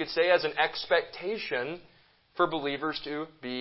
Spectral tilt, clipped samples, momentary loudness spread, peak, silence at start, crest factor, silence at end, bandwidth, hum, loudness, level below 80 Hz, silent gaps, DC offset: -7.5 dB/octave; under 0.1%; 12 LU; -10 dBFS; 0 s; 20 dB; 0 s; 5.8 kHz; none; -29 LUFS; -68 dBFS; none; under 0.1%